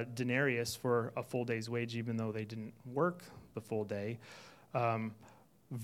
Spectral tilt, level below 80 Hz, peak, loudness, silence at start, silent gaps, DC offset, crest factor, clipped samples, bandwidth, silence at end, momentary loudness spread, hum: -6 dB/octave; -76 dBFS; -18 dBFS; -37 LUFS; 0 s; none; under 0.1%; 18 dB; under 0.1%; 16 kHz; 0 s; 15 LU; none